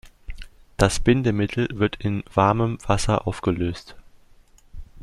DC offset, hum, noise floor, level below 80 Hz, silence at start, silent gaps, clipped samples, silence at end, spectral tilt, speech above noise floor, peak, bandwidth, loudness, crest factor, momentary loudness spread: under 0.1%; none; -52 dBFS; -38 dBFS; 0.05 s; none; under 0.1%; 0 s; -6 dB/octave; 31 dB; -2 dBFS; 13 kHz; -22 LUFS; 22 dB; 19 LU